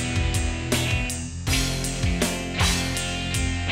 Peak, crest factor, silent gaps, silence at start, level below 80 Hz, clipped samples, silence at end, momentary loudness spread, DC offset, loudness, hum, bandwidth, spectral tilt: -10 dBFS; 14 dB; none; 0 s; -32 dBFS; under 0.1%; 0 s; 4 LU; under 0.1%; -24 LUFS; none; 16 kHz; -3.5 dB/octave